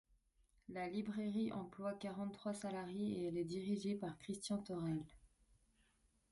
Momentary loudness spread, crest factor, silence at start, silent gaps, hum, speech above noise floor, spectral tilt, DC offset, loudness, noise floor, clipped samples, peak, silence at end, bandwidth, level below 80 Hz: 5 LU; 14 dB; 0.7 s; none; none; 34 dB; -6 dB/octave; under 0.1%; -44 LUFS; -78 dBFS; under 0.1%; -30 dBFS; 1.05 s; 11.5 kHz; -74 dBFS